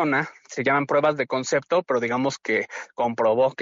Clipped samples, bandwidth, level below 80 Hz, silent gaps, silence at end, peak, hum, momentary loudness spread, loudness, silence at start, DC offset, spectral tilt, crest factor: under 0.1%; 7.8 kHz; -68 dBFS; none; 0 s; -10 dBFS; none; 6 LU; -23 LUFS; 0 s; under 0.1%; -4 dB/octave; 14 dB